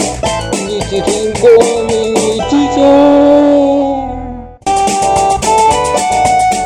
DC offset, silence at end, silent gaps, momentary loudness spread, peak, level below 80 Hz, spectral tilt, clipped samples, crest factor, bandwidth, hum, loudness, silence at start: under 0.1%; 0 s; none; 9 LU; 0 dBFS; -32 dBFS; -4.5 dB/octave; 0.5%; 10 dB; 14.5 kHz; none; -10 LUFS; 0 s